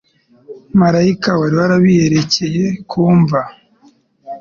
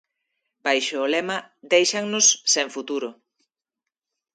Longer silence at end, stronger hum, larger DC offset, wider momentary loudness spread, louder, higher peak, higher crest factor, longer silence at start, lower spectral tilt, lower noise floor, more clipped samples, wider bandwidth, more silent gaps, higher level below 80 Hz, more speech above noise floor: second, 0 s vs 1.25 s; neither; neither; second, 8 LU vs 13 LU; first, -13 LUFS vs -21 LUFS; about the same, -2 dBFS vs -4 dBFS; second, 12 dB vs 20 dB; second, 0.5 s vs 0.65 s; first, -6.5 dB/octave vs -0.5 dB/octave; second, -51 dBFS vs -86 dBFS; neither; second, 7.2 kHz vs 10.5 kHz; neither; first, -48 dBFS vs -80 dBFS; second, 38 dB vs 64 dB